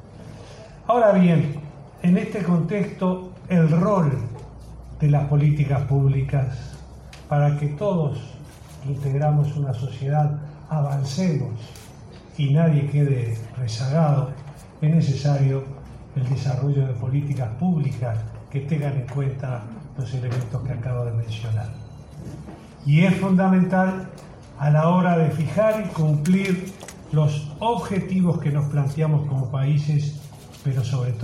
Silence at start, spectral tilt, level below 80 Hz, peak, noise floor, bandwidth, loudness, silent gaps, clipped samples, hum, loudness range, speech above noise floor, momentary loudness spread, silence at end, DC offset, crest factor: 0.05 s; -8.5 dB/octave; -48 dBFS; -6 dBFS; -42 dBFS; 11 kHz; -22 LUFS; none; under 0.1%; none; 6 LU; 21 dB; 20 LU; 0 s; under 0.1%; 14 dB